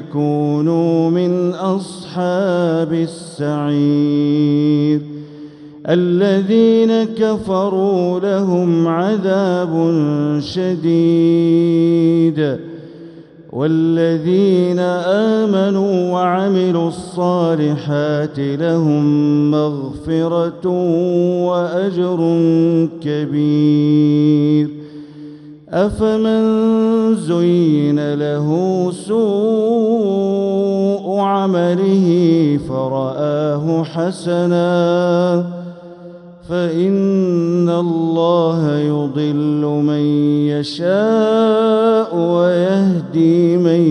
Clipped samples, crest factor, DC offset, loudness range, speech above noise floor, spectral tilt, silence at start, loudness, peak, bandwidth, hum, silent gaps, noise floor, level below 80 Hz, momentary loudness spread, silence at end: under 0.1%; 14 dB; under 0.1%; 2 LU; 23 dB; -8 dB/octave; 0 s; -15 LUFS; -2 dBFS; 10.5 kHz; none; none; -37 dBFS; -52 dBFS; 7 LU; 0 s